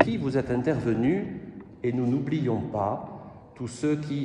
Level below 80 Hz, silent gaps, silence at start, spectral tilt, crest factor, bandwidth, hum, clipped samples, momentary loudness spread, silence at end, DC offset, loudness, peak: -56 dBFS; none; 0 s; -8 dB/octave; 24 dB; 10.5 kHz; none; under 0.1%; 15 LU; 0 s; under 0.1%; -28 LUFS; -4 dBFS